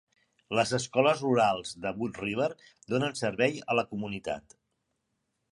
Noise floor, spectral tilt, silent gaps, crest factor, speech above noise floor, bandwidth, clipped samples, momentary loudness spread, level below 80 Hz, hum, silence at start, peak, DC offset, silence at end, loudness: -80 dBFS; -5 dB/octave; none; 20 dB; 51 dB; 11.5 kHz; under 0.1%; 10 LU; -64 dBFS; none; 0.5 s; -10 dBFS; under 0.1%; 1.1 s; -29 LUFS